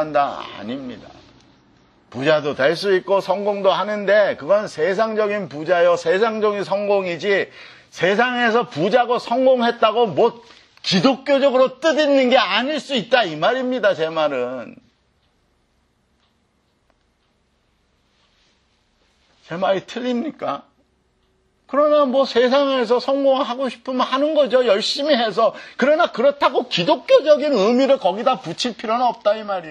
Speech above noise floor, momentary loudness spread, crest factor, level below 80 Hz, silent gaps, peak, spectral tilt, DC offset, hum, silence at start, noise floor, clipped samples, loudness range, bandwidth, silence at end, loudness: 46 dB; 9 LU; 18 dB; -66 dBFS; none; -2 dBFS; -4.5 dB/octave; under 0.1%; none; 0 s; -64 dBFS; under 0.1%; 10 LU; 10.5 kHz; 0 s; -18 LUFS